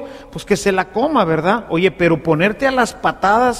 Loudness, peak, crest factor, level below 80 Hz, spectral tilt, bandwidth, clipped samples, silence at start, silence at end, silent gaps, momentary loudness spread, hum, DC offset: -16 LUFS; -2 dBFS; 16 dB; -44 dBFS; -5.5 dB/octave; 15 kHz; under 0.1%; 0 s; 0 s; none; 3 LU; none; under 0.1%